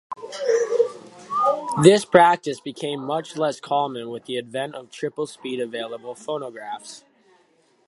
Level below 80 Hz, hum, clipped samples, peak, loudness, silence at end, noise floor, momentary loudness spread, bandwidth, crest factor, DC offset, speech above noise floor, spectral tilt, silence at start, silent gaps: -68 dBFS; none; under 0.1%; 0 dBFS; -22 LUFS; 0.9 s; -61 dBFS; 18 LU; 11.5 kHz; 22 dB; under 0.1%; 39 dB; -5 dB/octave; 0.1 s; none